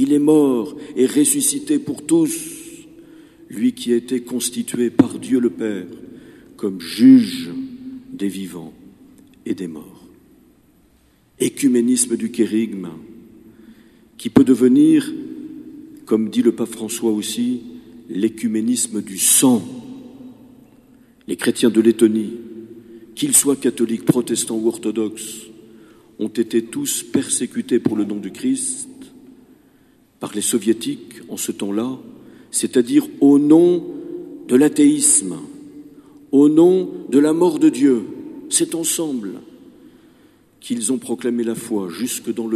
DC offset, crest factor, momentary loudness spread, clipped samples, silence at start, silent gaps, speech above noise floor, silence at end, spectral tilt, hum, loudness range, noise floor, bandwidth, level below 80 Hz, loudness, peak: under 0.1%; 18 dB; 20 LU; under 0.1%; 0 s; none; 38 dB; 0 s; -4 dB/octave; none; 8 LU; -56 dBFS; 14 kHz; -62 dBFS; -18 LUFS; 0 dBFS